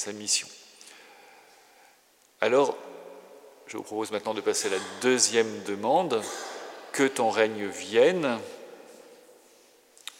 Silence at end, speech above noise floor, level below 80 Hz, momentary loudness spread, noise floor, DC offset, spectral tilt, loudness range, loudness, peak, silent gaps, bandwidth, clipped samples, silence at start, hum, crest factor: 1.05 s; 35 dB; -88 dBFS; 23 LU; -62 dBFS; under 0.1%; -2.5 dB/octave; 6 LU; -26 LUFS; -6 dBFS; none; 16 kHz; under 0.1%; 0 s; none; 22 dB